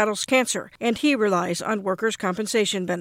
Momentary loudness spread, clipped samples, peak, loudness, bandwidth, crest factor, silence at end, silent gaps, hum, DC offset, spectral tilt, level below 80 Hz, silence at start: 5 LU; under 0.1%; -8 dBFS; -23 LUFS; 16.5 kHz; 16 dB; 0 s; none; none; under 0.1%; -3.5 dB/octave; -66 dBFS; 0 s